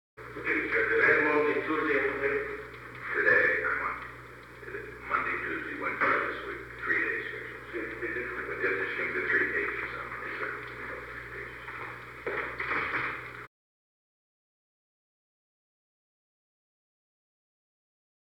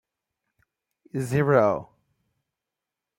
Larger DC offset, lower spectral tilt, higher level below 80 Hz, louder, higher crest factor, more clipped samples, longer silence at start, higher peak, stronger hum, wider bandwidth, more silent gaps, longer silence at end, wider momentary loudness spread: neither; second, -6 dB/octave vs -7.5 dB/octave; about the same, -58 dBFS vs -62 dBFS; second, -30 LUFS vs -23 LUFS; about the same, 22 dB vs 22 dB; neither; second, 0.15 s vs 1.15 s; second, -10 dBFS vs -6 dBFS; first, 60 Hz at -60 dBFS vs none; first, 18.5 kHz vs 16 kHz; neither; first, 4.8 s vs 1.35 s; first, 16 LU vs 13 LU